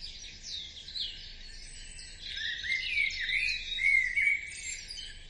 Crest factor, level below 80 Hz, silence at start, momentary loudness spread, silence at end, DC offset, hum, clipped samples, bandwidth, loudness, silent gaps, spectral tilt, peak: 18 dB; -50 dBFS; 0 s; 20 LU; 0 s; under 0.1%; none; under 0.1%; 11.5 kHz; -30 LUFS; none; 1 dB/octave; -16 dBFS